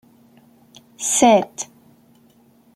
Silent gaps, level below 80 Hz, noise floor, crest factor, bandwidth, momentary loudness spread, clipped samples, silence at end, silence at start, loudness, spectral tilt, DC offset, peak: none; -64 dBFS; -54 dBFS; 20 dB; 16 kHz; 18 LU; under 0.1%; 1.1 s; 1 s; -17 LUFS; -3 dB/octave; under 0.1%; -2 dBFS